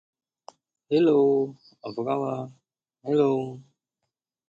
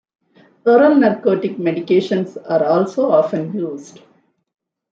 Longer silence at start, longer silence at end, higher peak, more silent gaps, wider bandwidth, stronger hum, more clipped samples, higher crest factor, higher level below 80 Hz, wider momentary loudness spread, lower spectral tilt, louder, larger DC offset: first, 0.9 s vs 0.65 s; second, 0.85 s vs 1.1 s; second, -10 dBFS vs -2 dBFS; neither; about the same, 7.6 kHz vs 7.6 kHz; neither; neither; about the same, 18 dB vs 16 dB; second, -74 dBFS vs -66 dBFS; first, 20 LU vs 11 LU; about the same, -8.5 dB/octave vs -7.5 dB/octave; second, -24 LUFS vs -16 LUFS; neither